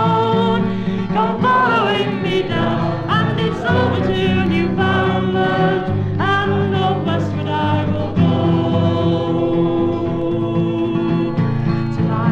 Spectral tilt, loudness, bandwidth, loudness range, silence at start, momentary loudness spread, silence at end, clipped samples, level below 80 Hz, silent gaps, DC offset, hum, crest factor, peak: -8 dB/octave; -17 LUFS; 7.8 kHz; 1 LU; 0 s; 4 LU; 0 s; under 0.1%; -42 dBFS; none; under 0.1%; none; 14 dB; -2 dBFS